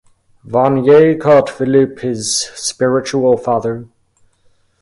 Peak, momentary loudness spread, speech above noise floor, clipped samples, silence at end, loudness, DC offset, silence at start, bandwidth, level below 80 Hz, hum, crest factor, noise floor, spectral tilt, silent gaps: 0 dBFS; 10 LU; 42 dB; under 0.1%; 0.95 s; -13 LUFS; under 0.1%; 0.45 s; 11.5 kHz; -54 dBFS; none; 14 dB; -55 dBFS; -5 dB/octave; none